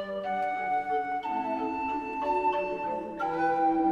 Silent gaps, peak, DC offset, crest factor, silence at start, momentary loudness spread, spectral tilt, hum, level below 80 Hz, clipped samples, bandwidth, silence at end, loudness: none; -16 dBFS; under 0.1%; 14 dB; 0 s; 6 LU; -6.5 dB/octave; none; -60 dBFS; under 0.1%; 7.8 kHz; 0 s; -30 LUFS